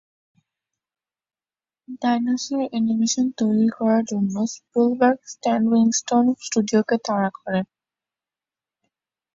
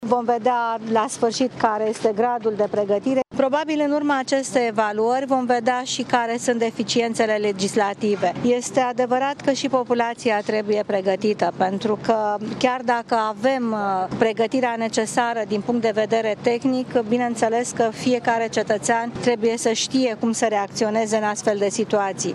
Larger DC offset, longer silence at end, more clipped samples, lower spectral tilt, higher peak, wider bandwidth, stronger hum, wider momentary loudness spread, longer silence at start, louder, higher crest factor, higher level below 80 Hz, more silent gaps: neither; first, 1.7 s vs 0 s; neither; about the same, -5 dB/octave vs -4 dB/octave; about the same, -4 dBFS vs -2 dBFS; second, 7.8 kHz vs 12.5 kHz; neither; first, 8 LU vs 2 LU; first, 1.9 s vs 0 s; about the same, -21 LUFS vs -21 LUFS; about the same, 18 dB vs 18 dB; about the same, -68 dBFS vs -64 dBFS; neither